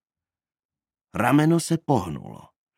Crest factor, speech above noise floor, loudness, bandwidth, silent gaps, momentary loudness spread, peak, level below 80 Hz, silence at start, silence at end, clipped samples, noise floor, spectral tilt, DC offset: 20 dB; over 68 dB; -22 LUFS; 16 kHz; none; 17 LU; -4 dBFS; -58 dBFS; 1.15 s; 0.45 s; under 0.1%; under -90 dBFS; -6 dB/octave; under 0.1%